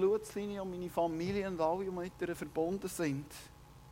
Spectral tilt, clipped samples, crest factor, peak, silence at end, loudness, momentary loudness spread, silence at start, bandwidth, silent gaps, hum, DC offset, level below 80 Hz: -6 dB/octave; under 0.1%; 16 dB; -20 dBFS; 0 s; -37 LUFS; 7 LU; 0 s; 16 kHz; none; 60 Hz at -60 dBFS; under 0.1%; -60 dBFS